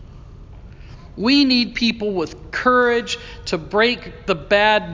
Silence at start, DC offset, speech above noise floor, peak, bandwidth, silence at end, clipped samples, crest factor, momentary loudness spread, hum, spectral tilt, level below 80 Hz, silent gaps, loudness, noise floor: 0 s; under 0.1%; 20 dB; -2 dBFS; 7.6 kHz; 0 s; under 0.1%; 18 dB; 11 LU; none; -4.5 dB/octave; -42 dBFS; none; -18 LUFS; -39 dBFS